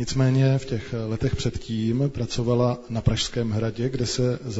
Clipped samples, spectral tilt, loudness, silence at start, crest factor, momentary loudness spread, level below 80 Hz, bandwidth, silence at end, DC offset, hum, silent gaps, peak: under 0.1%; -6 dB/octave; -25 LUFS; 0 s; 18 dB; 7 LU; -40 dBFS; 8 kHz; 0 s; under 0.1%; none; none; -6 dBFS